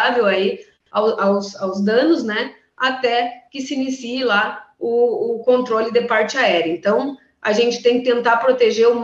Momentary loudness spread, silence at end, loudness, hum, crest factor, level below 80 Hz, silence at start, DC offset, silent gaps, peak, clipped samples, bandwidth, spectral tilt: 9 LU; 0 s; -18 LUFS; none; 14 dB; -66 dBFS; 0 s; under 0.1%; none; -4 dBFS; under 0.1%; 7.6 kHz; -4.5 dB/octave